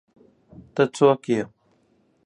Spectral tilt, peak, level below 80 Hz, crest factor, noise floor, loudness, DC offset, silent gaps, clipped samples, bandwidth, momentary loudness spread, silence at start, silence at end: -6 dB/octave; -4 dBFS; -64 dBFS; 22 dB; -64 dBFS; -22 LUFS; under 0.1%; none; under 0.1%; 11 kHz; 14 LU; 0.75 s; 0.8 s